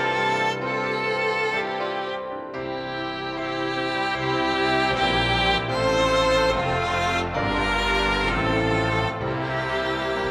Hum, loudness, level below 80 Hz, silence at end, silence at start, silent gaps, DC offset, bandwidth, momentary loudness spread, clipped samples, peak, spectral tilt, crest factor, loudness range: none; -23 LUFS; -40 dBFS; 0 s; 0 s; none; under 0.1%; 13.5 kHz; 9 LU; under 0.1%; -10 dBFS; -4.5 dB/octave; 14 dB; 5 LU